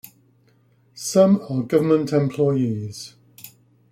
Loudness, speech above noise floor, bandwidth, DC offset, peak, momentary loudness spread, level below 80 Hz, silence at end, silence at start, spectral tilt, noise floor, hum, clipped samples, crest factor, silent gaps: -20 LUFS; 39 dB; 16 kHz; under 0.1%; -4 dBFS; 16 LU; -62 dBFS; 0.45 s; 0.95 s; -6.5 dB/octave; -59 dBFS; none; under 0.1%; 18 dB; none